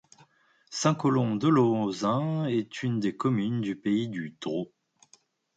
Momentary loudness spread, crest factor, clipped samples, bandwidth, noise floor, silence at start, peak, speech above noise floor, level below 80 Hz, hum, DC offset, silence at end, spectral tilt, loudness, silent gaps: 11 LU; 16 dB; under 0.1%; 9.2 kHz; -63 dBFS; 0.7 s; -12 dBFS; 37 dB; -70 dBFS; none; under 0.1%; 0.9 s; -6.5 dB/octave; -28 LUFS; none